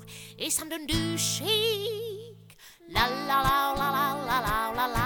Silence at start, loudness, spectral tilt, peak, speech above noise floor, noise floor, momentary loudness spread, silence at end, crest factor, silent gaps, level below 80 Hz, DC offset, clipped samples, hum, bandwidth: 0 s; -27 LUFS; -3 dB/octave; -10 dBFS; 25 dB; -52 dBFS; 10 LU; 0 s; 20 dB; none; -44 dBFS; under 0.1%; under 0.1%; none; 19 kHz